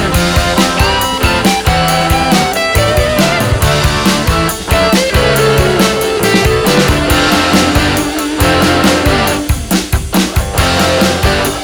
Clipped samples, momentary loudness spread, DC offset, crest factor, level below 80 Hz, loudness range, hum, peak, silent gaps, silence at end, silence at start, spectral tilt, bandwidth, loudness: under 0.1%; 4 LU; 0.6%; 10 dB; -20 dBFS; 1 LU; none; 0 dBFS; none; 0 s; 0 s; -4 dB/octave; over 20 kHz; -11 LUFS